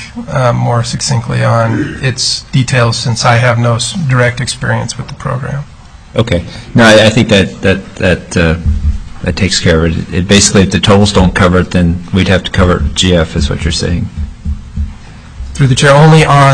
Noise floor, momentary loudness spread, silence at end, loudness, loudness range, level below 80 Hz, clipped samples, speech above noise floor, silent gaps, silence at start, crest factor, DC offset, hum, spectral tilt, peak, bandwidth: -29 dBFS; 13 LU; 0 s; -10 LUFS; 4 LU; -24 dBFS; 0.4%; 20 dB; none; 0 s; 10 dB; 0.3%; none; -5 dB/octave; 0 dBFS; 11 kHz